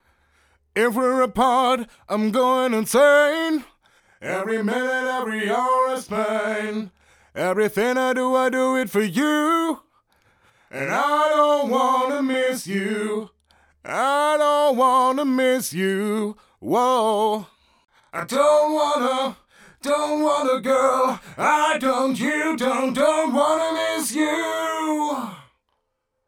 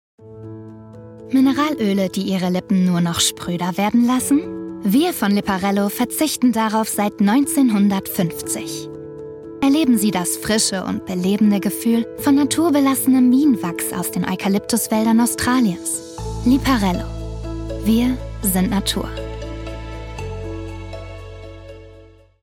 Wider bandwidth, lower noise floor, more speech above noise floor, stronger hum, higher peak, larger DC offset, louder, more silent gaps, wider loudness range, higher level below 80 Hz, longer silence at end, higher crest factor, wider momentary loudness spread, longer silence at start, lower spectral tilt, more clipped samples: about the same, over 20 kHz vs 18.5 kHz; first, -75 dBFS vs -46 dBFS; first, 55 dB vs 28 dB; neither; about the same, -6 dBFS vs -4 dBFS; neither; second, -21 LUFS vs -18 LUFS; neither; about the same, 3 LU vs 5 LU; second, -62 dBFS vs -38 dBFS; first, 0.85 s vs 0.4 s; about the same, 16 dB vs 14 dB; second, 10 LU vs 17 LU; first, 0.75 s vs 0.2 s; about the same, -4 dB/octave vs -4.5 dB/octave; neither